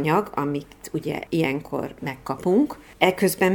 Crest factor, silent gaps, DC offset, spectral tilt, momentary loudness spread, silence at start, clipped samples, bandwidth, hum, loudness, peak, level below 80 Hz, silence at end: 24 dB; none; under 0.1%; -5.5 dB/octave; 11 LU; 0 s; under 0.1%; over 20 kHz; none; -24 LUFS; 0 dBFS; -54 dBFS; 0 s